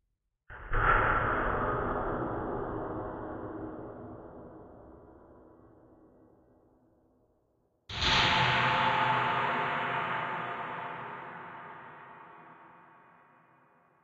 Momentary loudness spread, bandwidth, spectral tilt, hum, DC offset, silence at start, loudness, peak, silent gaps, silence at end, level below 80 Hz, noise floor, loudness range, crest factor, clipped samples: 24 LU; 8.4 kHz; -4.5 dB/octave; none; under 0.1%; 0.5 s; -30 LUFS; -14 dBFS; none; 1.25 s; -46 dBFS; -74 dBFS; 18 LU; 20 dB; under 0.1%